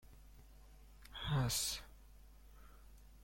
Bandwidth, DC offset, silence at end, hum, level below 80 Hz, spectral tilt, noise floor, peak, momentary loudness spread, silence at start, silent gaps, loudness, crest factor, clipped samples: 16.5 kHz; under 0.1%; 0 s; none; -56 dBFS; -3.5 dB/octave; -60 dBFS; -26 dBFS; 27 LU; 0.05 s; none; -39 LUFS; 20 dB; under 0.1%